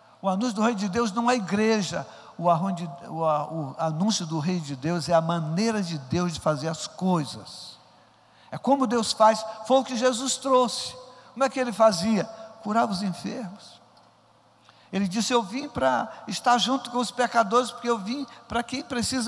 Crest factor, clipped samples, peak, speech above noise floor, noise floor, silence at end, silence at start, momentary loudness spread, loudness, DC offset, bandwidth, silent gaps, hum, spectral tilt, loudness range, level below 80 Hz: 18 dB; under 0.1%; -8 dBFS; 34 dB; -59 dBFS; 0 s; 0.25 s; 13 LU; -25 LUFS; under 0.1%; 12 kHz; none; none; -4.5 dB/octave; 5 LU; -62 dBFS